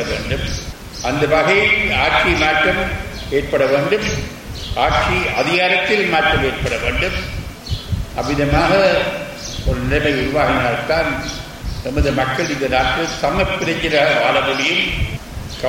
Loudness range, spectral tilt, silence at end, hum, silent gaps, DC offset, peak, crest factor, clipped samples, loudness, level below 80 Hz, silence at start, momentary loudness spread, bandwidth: 3 LU; -4.5 dB/octave; 0 s; none; none; under 0.1%; -2 dBFS; 14 dB; under 0.1%; -17 LUFS; -30 dBFS; 0 s; 12 LU; 16.5 kHz